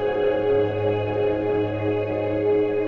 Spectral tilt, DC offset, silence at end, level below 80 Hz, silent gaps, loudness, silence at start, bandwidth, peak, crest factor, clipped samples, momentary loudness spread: -9 dB/octave; under 0.1%; 0 s; -50 dBFS; none; -23 LUFS; 0 s; 5.2 kHz; -10 dBFS; 12 dB; under 0.1%; 3 LU